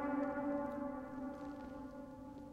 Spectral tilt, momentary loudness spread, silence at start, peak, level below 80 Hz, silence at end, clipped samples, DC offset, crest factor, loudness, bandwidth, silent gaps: -8 dB/octave; 12 LU; 0 s; -28 dBFS; -64 dBFS; 0 s; under 0.1%; under 0.1%; 16 dB; -44 LUFS; 8.4 kHz; none